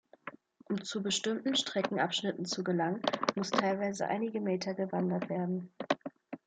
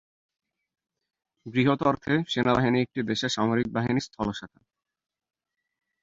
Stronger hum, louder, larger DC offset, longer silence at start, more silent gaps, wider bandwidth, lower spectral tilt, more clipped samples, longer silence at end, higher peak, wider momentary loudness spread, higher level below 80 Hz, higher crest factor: neither; second, -33 LUFS vs -26 LUFS; neither; second, 0.25 s vs 1.45 s; neither; first, 9.4 kHz vs 7.8 kHz; second, -4.5 dB/octave vs -6 dB/octave; neither; second, 0.1 s vs 1.55 s; about the same, -10 dBFS vs -8 dBFS; about the same, 7 LU vs 9 LU; second, -80 dBFS vs -56 dBFS; about the same, 24 dB vs 20 dB